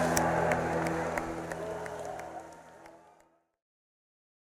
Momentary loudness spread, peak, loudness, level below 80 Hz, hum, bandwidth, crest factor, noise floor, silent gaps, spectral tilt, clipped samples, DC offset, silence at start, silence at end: 22 LU; -10 dBFS; -33 LUFS; -56 dBFS; none; 16 kHz; 26 dB; -66 dBFS; none; -5 dB/octave; under 0.1%; under 0.1%; 0 s; 1.5 s